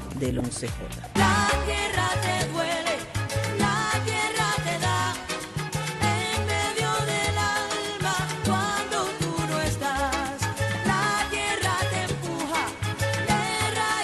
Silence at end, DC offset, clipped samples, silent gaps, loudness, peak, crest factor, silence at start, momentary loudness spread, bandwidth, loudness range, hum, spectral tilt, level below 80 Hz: 0 s; under 0.1%; under 0.1%; none; -26 LUFS; -8 dBFS; 18 dB; 0 s; 6 LU; 12.5 kHz; 1 LU; none; -4 dB/octave; -42 dBFS